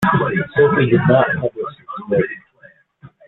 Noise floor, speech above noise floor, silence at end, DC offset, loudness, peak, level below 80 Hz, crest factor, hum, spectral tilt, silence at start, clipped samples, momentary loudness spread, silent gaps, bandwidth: -49 dBFS; 35 dB; 0.9 s; under 0.1%; -16 LUFS; 0 dBFS; -50 dBFS; 16 dB; none; -8.5 dB/octave; 0 s; under 0.1%; 15 LU; none; 11.5 kHz